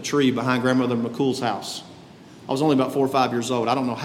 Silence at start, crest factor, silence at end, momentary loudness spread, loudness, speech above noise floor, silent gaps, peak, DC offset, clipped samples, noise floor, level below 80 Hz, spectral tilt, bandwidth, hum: 0 s; 16 dB; 0 s; 9 LU; -22 LUFS; 23 dB; none; -6 dBFS; under 0.1%; under 0.1%; -45 dBFS; -66 dBFS; -5.5 dB/octave; 15.5 kHz; none